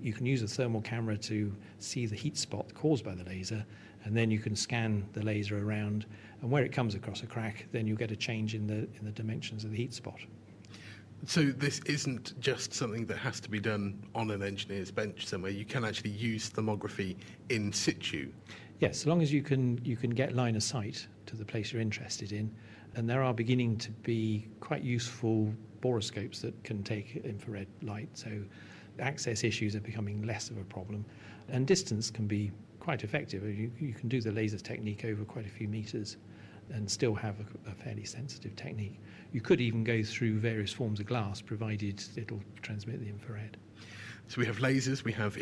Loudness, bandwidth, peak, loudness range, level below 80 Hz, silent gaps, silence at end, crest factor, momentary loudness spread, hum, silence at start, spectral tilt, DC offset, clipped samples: -35 LUFS; 11 kHz; -16 dBFS; 5 LU; -68 dBFS; none; 0 s; 20 dB; 13 LU; none; 0 s; -5.5 dB/octave; under 0.1%; under 0.1%